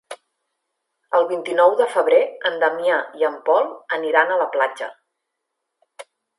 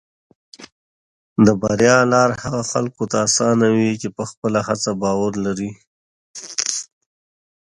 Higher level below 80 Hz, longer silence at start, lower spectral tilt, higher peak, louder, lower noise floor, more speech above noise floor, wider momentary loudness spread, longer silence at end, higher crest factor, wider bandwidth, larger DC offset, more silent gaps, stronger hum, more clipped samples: second, -82 dBFS vs -54 dBFS; second, 0.1 s vs 0.6 s; second, -3 dB/octave vs -4.5 dB/octave; about the same, 0 dBFS vs 0 dBFS; about the same, -19 LUFS vs -18 LUFS; second, -79 dBFS vs under -90 dBFS; second, 60 dB vs over 73 dB; second, 9 LU vs 13 LU; second, 0.35 s vs 0.8 s; about the same, 20 dB vs 20 dB; about the same, 11.5 kHz vs 11.5 kHz; neither; second, none vs 0.72-1.36 s, 4.37-4.42 s, 5.87-6.34 s; neither; neither